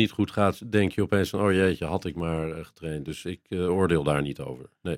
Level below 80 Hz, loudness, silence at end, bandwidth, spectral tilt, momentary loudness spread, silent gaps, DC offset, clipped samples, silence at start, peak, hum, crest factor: -52 dBFS; -26 LUFS; 0 s; 16 kHz; -6.5 dB/octave; 12 LU; none; under 0.1%; under 0.1%; 0 s; -8 dBFS; none; 18 dB